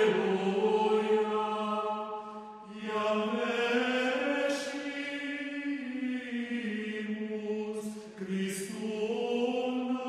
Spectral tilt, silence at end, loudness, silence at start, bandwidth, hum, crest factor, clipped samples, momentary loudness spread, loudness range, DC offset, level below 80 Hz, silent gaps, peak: -5 dB/octave; 0 s; -32 LUFS; 0 s; 13 kHz; none; 16 dB; under 0.1%; 9 LU; 5 LU; under 0.1%; -76 dBFS; none; -16 dBFS